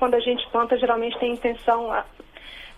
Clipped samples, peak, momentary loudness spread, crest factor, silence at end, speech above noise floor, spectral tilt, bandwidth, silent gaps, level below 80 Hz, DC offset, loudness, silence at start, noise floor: under 0.1%; -8 dBFS; 19 LU; 16 dB; 0 s; 19 dB; -5 dB/octave; 11 kHz; none; -50 dBFS; under 0.1%; -23 LUFS; 0 s; -42 dBFS